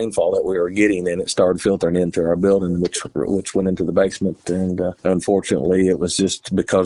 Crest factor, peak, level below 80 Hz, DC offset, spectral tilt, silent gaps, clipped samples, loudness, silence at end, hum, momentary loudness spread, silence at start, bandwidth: 16 dB; -2 dBFS; -46 dBFS; under 0.1%; -5.5 dB/octave; none; under 0.1%; -19 LUFS; 0 s; none; 5 LU; 0 s; 11.5 kHz